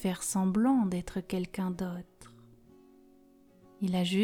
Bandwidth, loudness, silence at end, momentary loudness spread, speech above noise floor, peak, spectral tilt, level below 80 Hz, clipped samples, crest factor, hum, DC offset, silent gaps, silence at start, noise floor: 16.5 kHz; -31 LUFS; 0 s; 11 LU; 30 dB; -16 dBFS; -5.5 dB/octave; -58 dBFS; under 0.1%; 16 dB; none; under 0.1%; none; 0 s; -60 dBFS